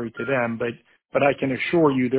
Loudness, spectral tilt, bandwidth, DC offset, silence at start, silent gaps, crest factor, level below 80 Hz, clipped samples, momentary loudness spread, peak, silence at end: -23 LUFS; -10.5 dB/octave; 4 kHz; under 0.1%; 0 s; none; 18 dB; -58 dBFS; under 0.1%; 10 LU; -6 dBFS; 0 s